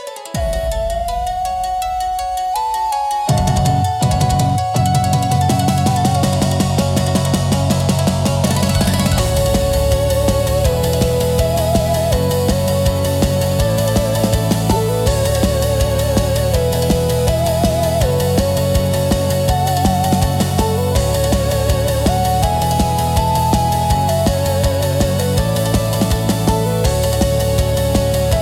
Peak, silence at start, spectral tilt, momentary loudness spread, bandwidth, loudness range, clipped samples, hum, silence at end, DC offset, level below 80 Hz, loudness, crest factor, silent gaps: -2 dBFS; 0 s; -5.5 dB/octave; 3 LU; 17 kHz; 1 LU; under 0.1%; none; 0 s; under 0.1%; -24 dBFS; -16 LUFS; 12 dB; none